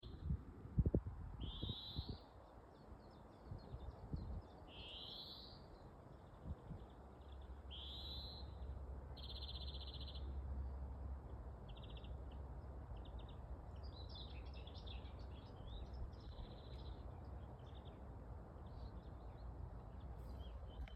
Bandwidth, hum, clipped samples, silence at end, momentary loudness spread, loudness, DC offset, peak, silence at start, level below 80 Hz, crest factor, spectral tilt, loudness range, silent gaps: 8.2 kHz; none; under 0.1%; 0 s; 10 LU; -52 LUFS; under 0.1%; -24 dBFS; 0 s; -54 dBFS; 28 dB; -7.5 dB/octave; 5 LU; none